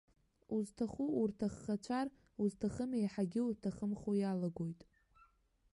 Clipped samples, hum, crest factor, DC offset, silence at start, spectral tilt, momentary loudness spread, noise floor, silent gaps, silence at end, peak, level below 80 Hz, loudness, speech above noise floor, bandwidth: under 0.1%; none; 14 dB; under 0.1%; 0.5 s; -7.5 dB/octave; 6 LU; -72 dBFS; none; 1 s; -26 dBFS; -68 dBFS; -39 LUFS; 34 dB; 11.5 kHz